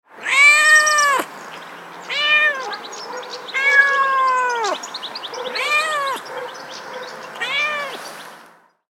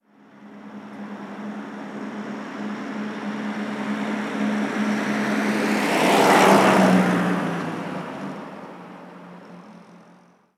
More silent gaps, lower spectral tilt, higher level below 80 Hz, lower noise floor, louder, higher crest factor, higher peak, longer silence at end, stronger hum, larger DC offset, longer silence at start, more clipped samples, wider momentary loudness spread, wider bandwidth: neither; second, 1 dB/octave vs -5 dB/octave; second, -84 dBFS vs -72 dBFS; second, -49 dBFS vs -53 dBFS; first, -15 LUFS vs -21 LUFS; about the same, 18 dB vs 22 dB; about the same, -2 dBFS vs -2 dBFS; about the same, 0.5 s vs 0.6 s; neither; neither; second, 0.15 s vs 0.35 s; neither; second, 21 LU vs 25 LU; first, 18 kHz vs 16 kHz